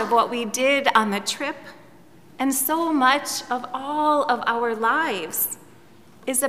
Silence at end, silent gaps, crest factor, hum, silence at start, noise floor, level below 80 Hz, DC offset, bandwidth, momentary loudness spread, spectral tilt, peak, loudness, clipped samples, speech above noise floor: 0 s; none; 20 dB; none; 0 s; -51 dBFS; -68 dBFS; 0.3%; 16 kHz; 9 LU; -2 dB/octave; -2 dBFS; -22 LUFS; under 0.1%; 29 dB